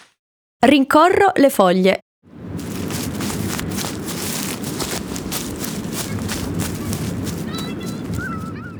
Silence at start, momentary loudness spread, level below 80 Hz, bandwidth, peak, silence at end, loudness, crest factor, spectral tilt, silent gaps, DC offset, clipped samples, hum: 0.6 s; 13 LU; -42 dBFS; over 20 kHz; 0 dBFS; 0 s; -20 LUFS; 18 dB; -4.5 dB/octave; 2.02-2.22 s; under 0.1%; under 0.1%; none